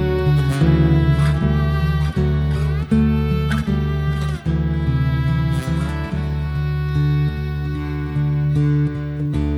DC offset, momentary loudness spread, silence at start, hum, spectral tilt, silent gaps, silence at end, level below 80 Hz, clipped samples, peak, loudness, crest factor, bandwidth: under 0.1%; 7 LU; 0 s; none; -8.5 dB/octave; none; 0 s; -26 dBFS; under 0.1%; -4 dBFS; -19 LUFS; 14 dB; 10.5 kHz